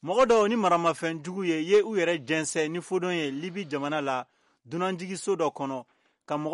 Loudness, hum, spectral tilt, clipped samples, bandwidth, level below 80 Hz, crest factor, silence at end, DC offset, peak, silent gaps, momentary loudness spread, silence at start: -27 LUFS; none; -4.5 dB/octave; under 0.1%; 11.5 kHz; -70 dBFS; 16 dB; 0 s; under 0.1%; -12 dBFS; none; 12 LU; 0.05 s